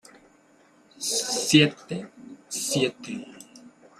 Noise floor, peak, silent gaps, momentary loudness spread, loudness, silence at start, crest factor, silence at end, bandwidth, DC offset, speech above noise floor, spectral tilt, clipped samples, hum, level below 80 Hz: -58 dBFS; -4 dBFS; none; 22 LU; -24 LUFS; 1 s; 24 dB; 0.3 s; 15 kHz; under 0.1%; 35 dB; -3.5 dB/octave; under 0.1%; none; -68 dBFS